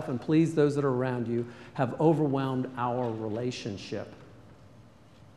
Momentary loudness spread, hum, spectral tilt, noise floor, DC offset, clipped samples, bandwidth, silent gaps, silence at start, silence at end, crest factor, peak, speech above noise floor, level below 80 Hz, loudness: 12 LU; none; -7.5 dB/octave; -55 dBFS; under 0.1%; under 0.1%; 11.5 kHz; none; 0 s; 0.55 s; 18 dB; -12 dBFS; 26 dB; -64 dBFS; -29 LUFS